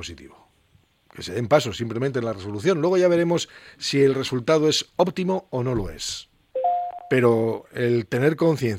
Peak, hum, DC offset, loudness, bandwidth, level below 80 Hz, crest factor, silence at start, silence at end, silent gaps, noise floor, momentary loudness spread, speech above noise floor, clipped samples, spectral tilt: -4 dBFS; none; under 0.1%; -23 LUFS; 16 kHz; -50 dBFS; 20 dB; 0 s; 0 s; none; -61 dBFS; 11 LU; 39 dB; under 0.1%; -5.5 dB/octave